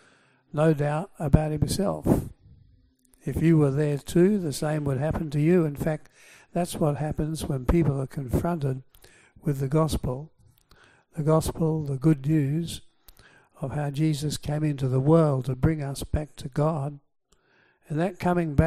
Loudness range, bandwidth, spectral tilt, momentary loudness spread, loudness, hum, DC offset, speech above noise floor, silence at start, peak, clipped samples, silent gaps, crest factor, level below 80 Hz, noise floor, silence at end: 4 LU; 15 kHz; -7.5 dB/octave; 11 LU; -26 LUFS; none; under 0.1%; 39 dB; 0.55 s; -2 dBFS; under 0.1%; none; 22 dB; -40 dBFS; -64 dBFS; 0 s